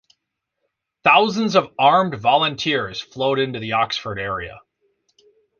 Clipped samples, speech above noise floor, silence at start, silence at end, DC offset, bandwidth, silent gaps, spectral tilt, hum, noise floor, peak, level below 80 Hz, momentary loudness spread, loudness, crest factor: under 0.1%; 59 dB; 1.05 s; 1 s; under 0.1%; 7.2 kHz; none; -4.5 dB/octave; none; -78 dBFS; -2 dBFS; -54 dBFS; 11 LU; -19 LUFS; 20 dB